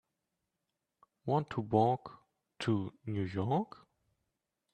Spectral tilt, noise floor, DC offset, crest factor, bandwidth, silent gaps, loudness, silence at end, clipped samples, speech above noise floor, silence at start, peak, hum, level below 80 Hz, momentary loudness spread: -8 dB/octave; -87 dBFS; under 0.1%; 22 dB; 9 kHz; none; -34 LUFS; 1.1 s; under 0.1%; 54 dB; 1.25 s; -14 dBFS; none; -72 dBFS; 13 LU